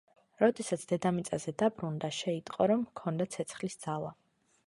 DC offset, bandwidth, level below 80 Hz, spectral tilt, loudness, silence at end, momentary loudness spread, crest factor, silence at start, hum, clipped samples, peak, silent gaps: under 0.1%; 11.5 kHz; -70 dBFS; -5.5 dB/octave; -33 LUFS; 0.55 s; 8 LU; 20 dB; 0.4 s; none; under 0.1%; -12 dBFS; none